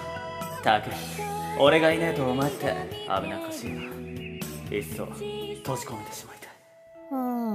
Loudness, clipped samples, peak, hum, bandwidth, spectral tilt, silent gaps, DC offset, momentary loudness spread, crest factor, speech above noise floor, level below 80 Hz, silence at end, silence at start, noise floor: -28 LUFS; under 0.1%; -6 dBFS; none; 16 kHz; -5 dB/octave; none; under 0.1%; 15 LU; 24 dB; 24 dB; -56 dBFS; 0 s; 0 s; -51 dBFS